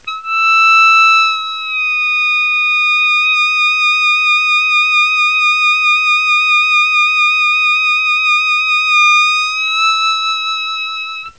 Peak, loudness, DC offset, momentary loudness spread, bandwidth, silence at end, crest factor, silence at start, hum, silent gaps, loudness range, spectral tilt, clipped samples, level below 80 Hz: -2 dBFS; -10 LUFS; 0.4%; 8 LU; 8 kHz; 0.1 s; 10 dB; 0.05 s; none; none; 1 LU; 5 dB/octave; under 0.1%; -64 dBFS